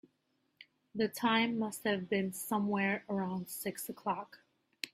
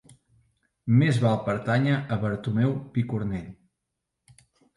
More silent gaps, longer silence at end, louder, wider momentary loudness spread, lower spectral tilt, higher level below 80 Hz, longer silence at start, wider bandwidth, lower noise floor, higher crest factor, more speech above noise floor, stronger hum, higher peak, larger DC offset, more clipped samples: neither; second, 0.05 s vs 1.25 s; second, -35 LUFS vs -25 LUFS; about the same, 10 LU vs 11 LU; second, -4.5 dB/octave vs -8 dB/octave; second, -78 dBFS vs -56 dBFS; second, 0.6 s vs 0.85 s; first, 16 kHz vs 11.5 kHz; second, -79 dBFS vs -83 dBFS; about the same, 20 dB vs 16 dB; second, 44 dB vs 59 dB; neither; second, -16 dBFS vs -10 dBFS; neither; neither